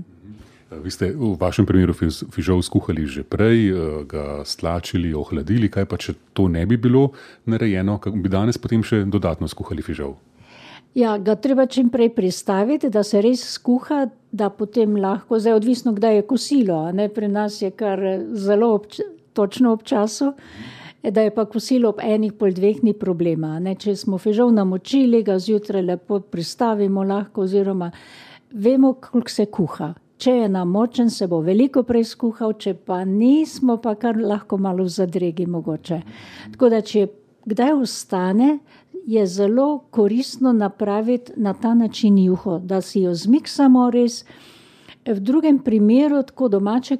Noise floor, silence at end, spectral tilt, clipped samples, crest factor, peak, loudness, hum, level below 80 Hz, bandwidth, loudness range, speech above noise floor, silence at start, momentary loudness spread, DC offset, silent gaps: -47 dBFS; 0 s; -7 dB/octave; under 0.1%; 16 dB; -4 dBFS; -19 LUFS; none; -46 dBFS; 13.5 kHz; 3 LU; 29 dB; 0 s; 10 LU; under 0.1%; none